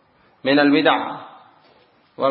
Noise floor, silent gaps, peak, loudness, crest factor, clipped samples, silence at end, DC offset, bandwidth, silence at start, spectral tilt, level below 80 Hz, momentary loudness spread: -56 dBFS; none; -2 dBFS; -18 LUFS; 20 dB; under 0.1%; 0 s; under 0.1%; 4.6 kHz; 0.45 s; -10 dB/octave; -72 dBFS; 15 LU